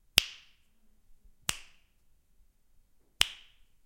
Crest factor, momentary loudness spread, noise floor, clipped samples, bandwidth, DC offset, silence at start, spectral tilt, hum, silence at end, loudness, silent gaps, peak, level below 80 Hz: 38 dB; 23 LU; -65 dBFS; under 0.1%; 16 kHz; under 0.1%; 0.15 s; 0.5 dB/octave; none; 0.5 s; -31 LUFS; none; 0 dBFS; -58 dBFS